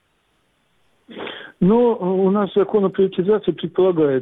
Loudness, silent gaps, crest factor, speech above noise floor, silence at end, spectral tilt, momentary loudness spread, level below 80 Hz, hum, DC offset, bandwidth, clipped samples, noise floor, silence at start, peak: -18 LUFS; none; 12 dB; 48 dB; 0 s; -10.5 dB/octave; 16 LU; -56 dBFS; none; under 0.1%; 4 kHz; under 0.1%; -64 dBFS; 1.1 s; -8 dBFS